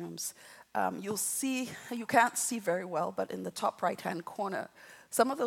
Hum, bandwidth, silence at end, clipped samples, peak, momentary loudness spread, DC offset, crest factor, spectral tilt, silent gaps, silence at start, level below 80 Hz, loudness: none; 17.5 kHz; 0 s; under 0.1%; -10 dBFS; 11 LU; under 0.1%; 24 dB; -3 dB/octave; none; 0 s; -82 dBFS; -33 LUFS